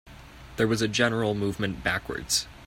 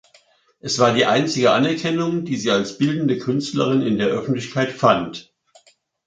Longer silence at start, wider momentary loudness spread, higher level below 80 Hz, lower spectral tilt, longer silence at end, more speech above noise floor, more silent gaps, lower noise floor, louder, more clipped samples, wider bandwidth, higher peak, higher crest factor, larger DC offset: second, 0.05 s vs 0.65 s; about the same, 5 LU vs 7 LU; first, -50 dBFS vs -60 dBFS; about the same, -4 dB/octave vs -5 dB/octave; second, 0 s vs 0.85 s; second, 19 dB vs 37 dB; neither; second, -46 dBFS vs -56 dBFS; second, -26 LUFS vs -19 LUFS; neither; first, 16.5 kHz vs 9.4 kHz; second, -8 dBFS vs -2 dBFS; about the same, 20 dB vs 18 dB; neither